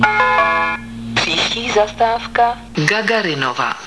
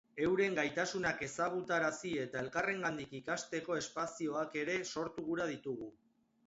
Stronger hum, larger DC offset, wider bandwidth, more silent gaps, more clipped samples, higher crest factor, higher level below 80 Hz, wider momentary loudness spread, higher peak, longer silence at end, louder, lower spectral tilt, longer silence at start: neither; neither; first, 11 kHz vs 8 kHz; neither; neither; about the same, 16 dB vs 18 dB; first, -42 dBFS vs -70 dBFS; about the same, 6 LU vs 7 LU; first, 0 dBFS vs -20 dBFS; second, 0 s vs 0.55 s; first, -16 LUFS vs -37 LUFS; about the same, -3.5 dB/octave vs -3.5 dB/octave; second, 0 s vs 0.15 s